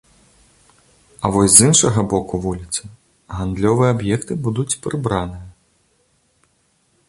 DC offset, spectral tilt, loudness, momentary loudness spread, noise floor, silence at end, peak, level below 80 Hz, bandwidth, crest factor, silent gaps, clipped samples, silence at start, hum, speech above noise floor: under 0.1%; -4.5 dB/octave; -16 LUFS; 16 LU; -62 dBFS; 1.6 s; 0 dBFS; -42 dBFS; 16 kHz; 20 dB; none; under 0.1%; 1.2 s; none; 45 dB